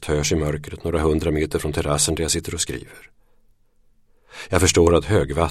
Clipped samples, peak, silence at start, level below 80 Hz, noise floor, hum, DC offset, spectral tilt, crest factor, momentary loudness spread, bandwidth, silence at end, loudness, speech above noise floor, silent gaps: under 0.1%; -2 dBFS; 0 s; -34 dBFS; -57 dBFS; none; under 0.1%; -4.5 dB/octave; 20 dB; 10 LU; 16 kHz; 0 s; -20 LUFS; 36 dB; none